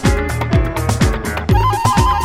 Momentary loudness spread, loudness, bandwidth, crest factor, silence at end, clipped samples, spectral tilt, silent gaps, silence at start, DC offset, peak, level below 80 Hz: 5 LU; -16 LUFS; 16.5 kHz; 14 dB; 0 s; under 0.1%; -5.5 dB/octave; none; 0 s; under 0.1%; -2 dBFS; -20 dBFS